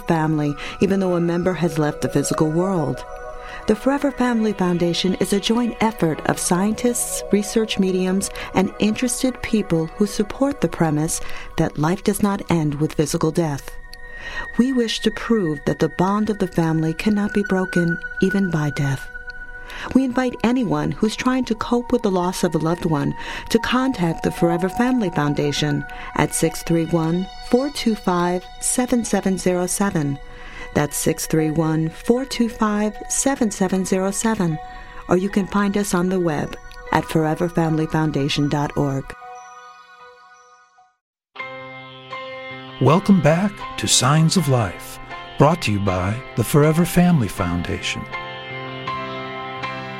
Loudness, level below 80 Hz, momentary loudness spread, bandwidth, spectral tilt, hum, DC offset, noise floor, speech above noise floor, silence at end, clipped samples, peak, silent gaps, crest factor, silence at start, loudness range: -20 LUFS; -40 dBFS; 12 LU; 16 kHz; -5 dB/octave; none; under 0.1%; -53 dBFS; 33 dB; 0 s; under 0.1%; -2 dBFS; 41.01-41.13 s; 20 dB; 0 s; 3 LU